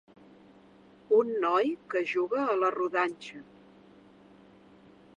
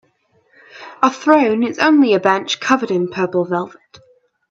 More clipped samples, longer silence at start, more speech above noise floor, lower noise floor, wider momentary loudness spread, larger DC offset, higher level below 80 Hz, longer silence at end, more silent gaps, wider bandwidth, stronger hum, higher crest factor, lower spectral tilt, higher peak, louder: neither; first, 1.1 s vs 0.75 s; second, 28 dB vs 44 dB; about the same, -57 dBFS vs -60 dBFS; about the same, 12 LU vs 10 LU; neither; second, -78 dBFS vs -66 dBFS; first, 1.75 s vs 0.85 s; neither; first, 9.6 kHz vs 7.6 kHz; neither; about the same, 18 dB vs 16 dB; about the same, -5 dB/octave vs -5 dB/octave; second, -12 dBFS vs 0 dBFS; second, -28 LUFS vs -16 LUFS